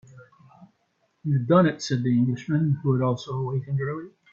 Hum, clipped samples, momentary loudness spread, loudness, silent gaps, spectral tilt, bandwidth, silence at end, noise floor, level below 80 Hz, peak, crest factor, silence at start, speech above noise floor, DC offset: none; under 0.1%; 9 LU; -24 LUFS; none; -7.5 dB/octave; 7.6 kHz; 0.25 s; -70 dBFS; -64 dBFS; -8 dBFS; 18 dB; 0.15 s; 47 dB; under 0.1%